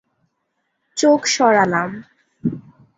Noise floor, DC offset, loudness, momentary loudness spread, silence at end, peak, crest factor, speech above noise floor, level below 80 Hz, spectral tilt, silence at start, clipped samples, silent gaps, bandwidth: -72 dBFS; under 0.1%; -17 LUFS; 17 LU; 0.4 s; -2 dBFS; 18 dB; 56 dB; -60 dBFS; -4 dB/octave; 0.95 s; under 0.1%; none; 8 kHz